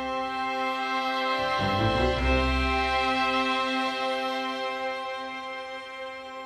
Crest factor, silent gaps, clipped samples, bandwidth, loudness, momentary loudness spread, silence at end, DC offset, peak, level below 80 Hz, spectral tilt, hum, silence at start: 16 dB; none; under 0.1%; 12.5 kHz; -27 LUFS; 11 LU; 0 s; under 0.1%; -10 dBFS; -38 dBFS; -5 dB/octave; none; 0 s